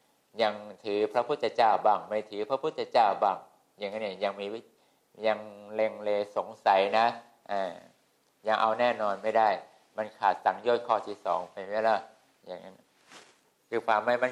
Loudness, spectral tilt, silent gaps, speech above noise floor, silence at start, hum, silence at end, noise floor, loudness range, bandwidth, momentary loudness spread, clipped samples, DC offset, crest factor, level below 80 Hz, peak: -29 LUFS; -4.5 dB/octave; none; 40 dB; 0.35 s; none; 0 s; -69 dBFS; 4 LU; 11.5 kHz; 14 LU; under 0.1%; under 0.1%; 20 dB; -82 dBFS; -10 dBFS